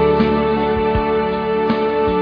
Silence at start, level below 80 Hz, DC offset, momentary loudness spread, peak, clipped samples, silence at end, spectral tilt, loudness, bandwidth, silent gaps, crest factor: 0 s; -32 dBFS; under 0.1%; 3 LU; -4 dBFS; under 0.1%; 0 s; -9 dB/octave; -17 LUFS; 5.2 kHz; none; 14 dB